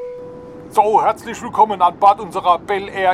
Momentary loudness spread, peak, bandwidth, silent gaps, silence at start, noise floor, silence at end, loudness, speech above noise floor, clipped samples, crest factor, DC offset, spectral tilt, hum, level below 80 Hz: 18 LU; -2 dBFS; 14 kHz; none; 0 s; -34 dBFS; 0 s; -16 LUFS; 19 dB; under 0.1%; 16 dB; under 0.1%; -4.5 dB/octave; none; -52 dBFS